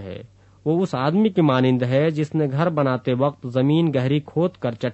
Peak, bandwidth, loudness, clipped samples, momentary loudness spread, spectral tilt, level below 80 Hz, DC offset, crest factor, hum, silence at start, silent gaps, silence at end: -4 dBFS; 8.2 kHz; -21 LUFS; under 0.1%; 6 LU; -8.5 dB/octave; -60 dBFS; under 0.1%; 16 dB; none; 0 s; none; 0 s